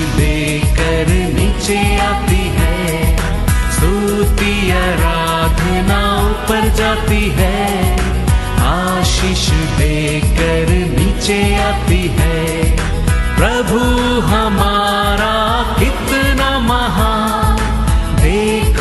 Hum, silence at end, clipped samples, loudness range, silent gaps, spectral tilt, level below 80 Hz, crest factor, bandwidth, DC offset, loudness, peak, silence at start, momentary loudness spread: none; 0 s; under 0.1%; 1 LU; none; -5 dB/octave; -18 dBFS; 12 dB; 12.5 kHz; under 0.1%; -14 LUFS; 0 dBFS; 0 s; 2 LU